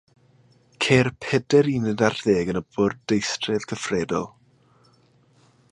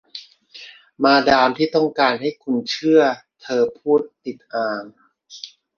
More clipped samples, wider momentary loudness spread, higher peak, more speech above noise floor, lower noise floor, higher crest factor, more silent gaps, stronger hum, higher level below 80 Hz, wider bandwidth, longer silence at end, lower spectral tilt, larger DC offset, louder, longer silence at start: neither; second, 8 LU vs 21 LU; about the same, -2 dBFS vs -2 dBFS; first, 37 dB vs 25 dB; first, -59 dBFS vs -43 dBFS; about the same, 22 dB vs 18 dB; neither; neither; about the same, -54 dBFS vs -58 dBFS; first, 11 kHz vs 7 kHz; first, 1.45 s vs 0.3 s; about the same, -5 dB/octave vs -5 dB/octave; neither; second, -23 LUFS vs -18 LUFS; first, 0.8 s vs 0.15 s